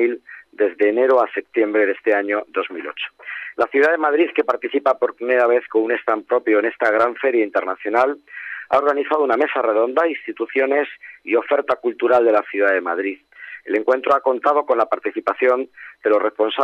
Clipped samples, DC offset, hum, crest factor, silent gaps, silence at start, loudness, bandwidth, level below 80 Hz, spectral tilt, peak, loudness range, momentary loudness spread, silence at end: under 0.1%; under 0.1%; none; 14 dB; none; 0 s; -19 LUFS; 6.8 kHz; -70 dBFS; -5 dB/octave; -6 dBFS; 1 LU; 11 LU; 0 s